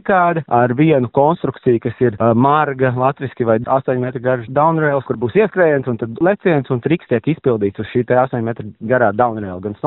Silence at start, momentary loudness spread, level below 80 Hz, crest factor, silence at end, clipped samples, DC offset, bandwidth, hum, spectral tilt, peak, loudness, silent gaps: 0.05 s; 6 LU; -52 dBFS; 14 dB; 0 s; under 0.1%; under 0.1%; 4 kHz; none; -7 dB/octave; -2 dBFS; -16 LUFS; none